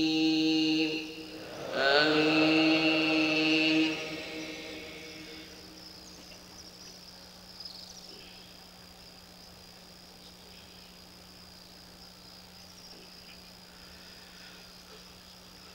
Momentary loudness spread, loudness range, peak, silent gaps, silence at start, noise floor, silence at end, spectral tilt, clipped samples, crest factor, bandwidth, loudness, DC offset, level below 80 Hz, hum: 25 LU; 23 LU; -10 dBFS; none; 0 s; -52 dBFS; 0 s; -4 dB/octave; under 0.1%; 24 dB; 16 kHz; -27 LUFS; under 0.1%; -64 dBFS; none